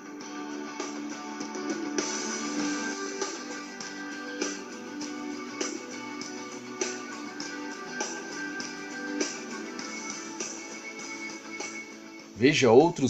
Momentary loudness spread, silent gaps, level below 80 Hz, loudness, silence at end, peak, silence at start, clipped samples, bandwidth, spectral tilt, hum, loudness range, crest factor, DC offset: 8 LU; none; -72 dBFS; -32 LUFS; 0 s; -6 dBFS; 0 s; under 0.1%; 13 kHz; -3.5 dB/octave; none; 3 LU; 26 dB; under 0.1%